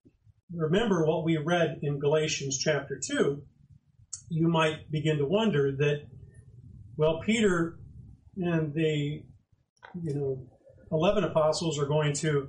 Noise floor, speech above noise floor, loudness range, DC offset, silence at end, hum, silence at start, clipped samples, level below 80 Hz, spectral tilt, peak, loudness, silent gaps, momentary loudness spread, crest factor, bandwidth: -59 dBFS; 31 dB; 3 LU; under 0.1%; 0 s; none; 0.5 s; under 0.1%; -54 dBFS; -5.5 dB/octave; -14 dBFS; -28 LUFS; 9.69-9.76 s; 13 LU; 16 dB; 10 kHz